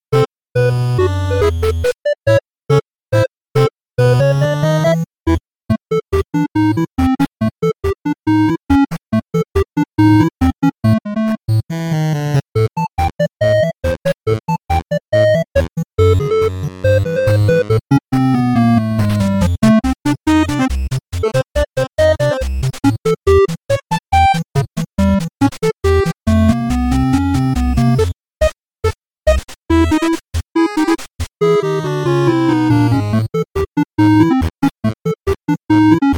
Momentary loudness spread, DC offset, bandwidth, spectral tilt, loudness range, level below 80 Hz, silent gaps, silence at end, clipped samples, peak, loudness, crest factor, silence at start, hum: 7 LU; 0.3%; 19 kHz; -7.5 dB/octave; 3 LU; -28 dBFS; 8.63-8.67 s; 0 s; under 0.1%; 0 dBFS; -15 LUFS; 14 dB; 0.1 s; none